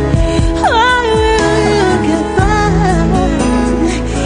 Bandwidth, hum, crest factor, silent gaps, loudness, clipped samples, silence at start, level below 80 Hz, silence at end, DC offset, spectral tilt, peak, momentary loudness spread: 10 kHz; none; 10 dB; none; -12 LUFS; under 0.1%; 0 s; -20 dBFS; 0 s; under 0.1%; -5.5 dB/octave; 0 dBFS; 3 LU